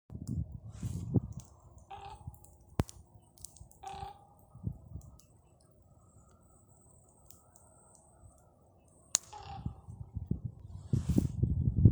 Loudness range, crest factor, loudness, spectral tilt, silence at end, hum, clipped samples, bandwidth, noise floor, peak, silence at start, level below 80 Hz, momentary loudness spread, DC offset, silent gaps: 23 LU; 36 dB; -37 LUFS; -6 dB/octave; 0 s; none; under 0.1%; over 20 kHz; -64 dBFS; -2 dBFS; 0.1 s; -48 dBFS; 25 LU; under 0.1%; none